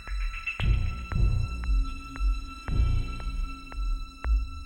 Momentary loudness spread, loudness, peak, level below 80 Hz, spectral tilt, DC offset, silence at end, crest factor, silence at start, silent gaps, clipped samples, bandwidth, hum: 8 LU; -32 LUFS; -12 dBFS; -28 dBFS; -6 dB/octave; under 0.1%; 0 s; 14 dB; 0 s; none; under 0.1%; 9.8 kHz; none